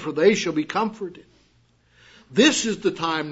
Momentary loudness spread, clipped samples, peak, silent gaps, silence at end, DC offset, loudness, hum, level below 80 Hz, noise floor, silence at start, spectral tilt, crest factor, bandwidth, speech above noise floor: 10 LU; under 0.1%; -4 dBFS; none; 0 s; under 0.1%; -21 LUFS; none; -62 dBFS; -61 dBFS; 0 s; -3.5 dB/octave; 20 dB; 8 kHz; 39 dB